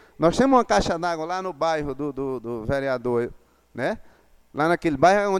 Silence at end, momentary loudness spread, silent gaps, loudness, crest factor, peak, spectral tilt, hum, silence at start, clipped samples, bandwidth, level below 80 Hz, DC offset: 0 s; 11 LU; none; -23 LUFS; 18 dB; -4 dBFS; -5.5 dB/octave; none; 0.2 s; under 0.1%; 13.5 kHz; -46 dBFS; under 0.1%